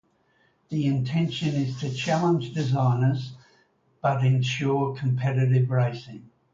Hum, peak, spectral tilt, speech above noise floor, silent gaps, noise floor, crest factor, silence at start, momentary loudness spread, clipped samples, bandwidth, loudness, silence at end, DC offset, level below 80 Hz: none; -10 dBFS; -7 dB/octave; 42 dB; none; -65 dBFS; 14 dB; 0.7 s; 7 LU; under 0.1%; 7.6 kHz; -25 LUFS; 0.3 s; under 0.1%; -62 dBFS